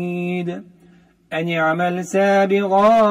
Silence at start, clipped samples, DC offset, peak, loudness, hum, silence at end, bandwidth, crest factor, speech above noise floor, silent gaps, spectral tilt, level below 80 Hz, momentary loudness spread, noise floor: 0 s; under 0.1%; under 0.1%; -4 dBFS; -18 LUFS; none; 0 s; 15.5 kHz; 16 dB; 34 dB; none; -6 dB/octave; -60 dBFS; 13 LU; -51 dBFS